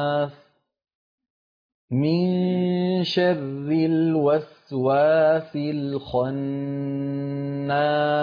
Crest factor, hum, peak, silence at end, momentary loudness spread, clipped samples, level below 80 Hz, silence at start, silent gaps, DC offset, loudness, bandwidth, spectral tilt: 14 dB; none; -10 dBFS; 0 s; 8 LU; under 0.1%; -62 dBFS; 0 s; 0.95-1.18 s, 1.30-1.88 s; under 0.1%; -23 LUFS; 5.2 kHz; -8.5 dB/octave